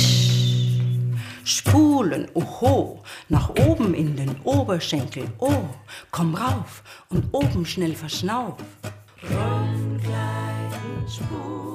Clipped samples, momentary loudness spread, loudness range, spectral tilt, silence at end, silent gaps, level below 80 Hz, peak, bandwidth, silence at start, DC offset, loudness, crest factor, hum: under 0.1%; 14 LU; 6 LU; -5.5 dB/octave; 0 s; none; -42 dBFS; -6 dBFS; 15.5 kHz; 0 s; under 0.1%; -23 LUFS; 16 dB; none